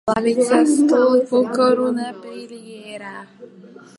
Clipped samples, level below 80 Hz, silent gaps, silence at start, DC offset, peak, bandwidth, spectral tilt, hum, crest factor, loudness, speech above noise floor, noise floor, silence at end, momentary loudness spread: under 0.1%; -60 dBFS; none; 0.05 s; under 0.1%; -2 dBFS; 11.5 kHz; -4.5 dB/octave; none; 16 dB; -16 LUFS; 25 dB; -43 dBFS; 0.3 s; 20 LU